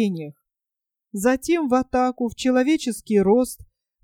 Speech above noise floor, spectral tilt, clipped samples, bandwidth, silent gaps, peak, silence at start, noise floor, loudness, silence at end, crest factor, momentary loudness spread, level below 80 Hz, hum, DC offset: 67 dB; -5.5 dB/octave; under 0.1%; 16.5 kHz; none; -6 dBFS; 0 s; -87 dBFS; -21 LUFS; 0.4 s; 16 dB; 14 LU; -52 dBFS; none; under 0.1%